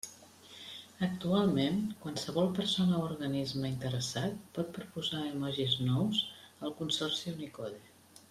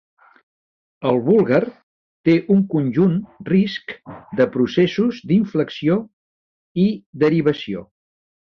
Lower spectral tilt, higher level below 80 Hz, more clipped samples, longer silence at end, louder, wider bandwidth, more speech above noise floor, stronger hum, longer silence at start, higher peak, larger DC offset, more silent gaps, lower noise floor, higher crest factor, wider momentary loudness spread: second, -5.5 dB/octave vs -8.5 dB/octave; second, -66 dBFS vs -58 dBFS; neither; second, 0.1 s vs 0.65 s; second, -34 LUFS vs -19 LUFS; first, 15 kHz vs 6.4 kHz; second, 21 dB vs over 72 dB; neither; second, 0.05 s vs 1 s; second, -16 dBFS vs -4 dBFS; neither; second, none vs 1.83-2.24 s, 6.13-6.75 s, 7.06-7.13 s; second, -55 dBFS vs under -90 dBFS; about the same, 18 dB vs 16 dB; about the same, 14 LU vs 14 LU